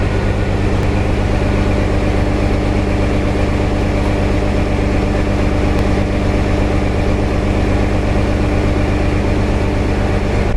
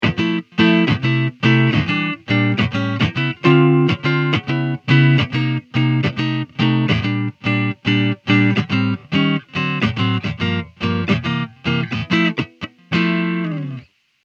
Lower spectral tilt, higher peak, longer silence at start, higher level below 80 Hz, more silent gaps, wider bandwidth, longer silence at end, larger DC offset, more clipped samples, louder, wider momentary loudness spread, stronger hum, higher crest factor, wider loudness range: about the same, -7 dB/octave vs -7.5 dB/octave; about the same, -2 dBFS vs 0 dBFS; about the same, 0 s vs 0 s; first, -18 dBFS vs -48 dBFS; neither; first, 11.5 kHz vs 7.2 kHz; second, 0 s vs 0.4 s; neither; neither; about the same, -16 LUFS vs -18 LUFS; second, 1 LU vs 8 LU; first, 50 Hz at -20 dBFS vs none; second, 12 dB vs 18 dB; second, 0 LU vs 4 LU